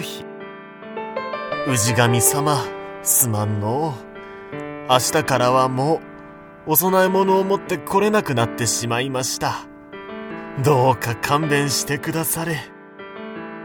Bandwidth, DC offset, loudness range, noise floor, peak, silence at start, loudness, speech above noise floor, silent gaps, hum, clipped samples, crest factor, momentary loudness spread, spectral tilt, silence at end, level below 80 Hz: over 20 kHz; under 0.1%; 2 LU; -40 dBFS; 0 dBFS; 0 s; -19 LUFS; 21 dB; none; none; under 0.1%; 20 dB; 19 LU; -4 dB/octave; 0 s; -54 dBFS